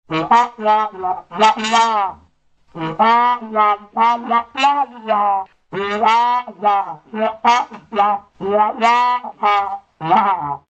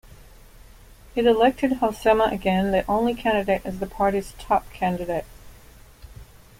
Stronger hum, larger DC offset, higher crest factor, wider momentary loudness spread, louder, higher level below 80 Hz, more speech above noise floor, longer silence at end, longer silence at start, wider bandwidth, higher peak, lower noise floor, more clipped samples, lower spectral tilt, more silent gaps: neither; neither; about the same, 16 dB vs 18 dB; about the same, 9 LU vs 10 LU; first, -17 LUFS vs -23 LUFS; second, -60 dBFS vs -44 dBFS; first, 38 dB vs 26 dB; second, 0.15 s vs 0.35 s; second, 0.1 s vs 1.15 s; second, 8.6 kHz vs 16.5 kHz; first, 0 dBFS vs -6 dBFS; first, -55 dBFS vs -48 dBFS; neither; second, -4 dB/octave vs -6 dB/octave; neither